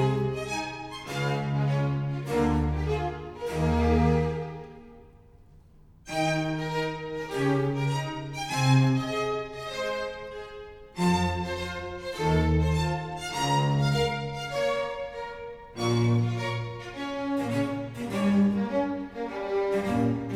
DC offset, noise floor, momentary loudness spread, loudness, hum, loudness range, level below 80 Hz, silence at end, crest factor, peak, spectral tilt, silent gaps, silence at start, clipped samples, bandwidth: under 0.1%; -54 dBFS; 11 LU; -28 LUFS; none; 3 LU; -40 dBFS; 0 s; 18 dB; -10 dBFS; -6.5 dB/octave; none; 0 s; under 0.1%; 14.5 kHz